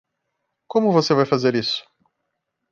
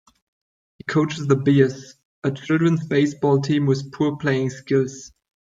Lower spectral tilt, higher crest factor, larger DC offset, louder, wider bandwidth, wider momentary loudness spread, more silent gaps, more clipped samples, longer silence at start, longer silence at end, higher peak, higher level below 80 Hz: about the same, -6 dB/octave vs -7 dB/octave; about the same, 18 dB vs 18 dB; neither; about the same, -20 LUFS vs -21 LUFS; about the same, 7.6 kHz vs 7.8 kHz; second, 7 LU vs 10 LU; second, none vs 2.05-2.22 s; neither; about the same, 0.75 s vs 0.85 s; first, 0.9 s vs 0.45 s; about the same, -4 dBFS vs -2 dBFS; about the same, -66 dBFS vs -62 dBFS